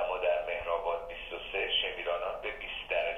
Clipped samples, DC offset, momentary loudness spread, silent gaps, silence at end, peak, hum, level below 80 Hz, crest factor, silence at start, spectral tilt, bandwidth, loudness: under 0.1%; under 0.1%; 8 LU; none; 0 s; -18 dBFS; none; -54 dBFS; 16 dB; 0 s; -3.5 dB/octave; 7 kHz; -33 LUFS